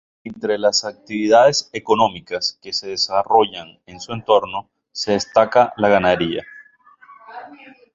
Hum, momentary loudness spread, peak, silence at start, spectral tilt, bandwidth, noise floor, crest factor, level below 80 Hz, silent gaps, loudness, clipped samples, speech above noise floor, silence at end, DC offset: none; 19 LU; 0 dBFS; 0.25 s; -3.5 dB/octave; 7.8 kHz; -49 dBFS; 18 dB; -54 dBFS; none; -18 LUFS; under 0.1%; 31 dB; 0.4 s; under 0.1%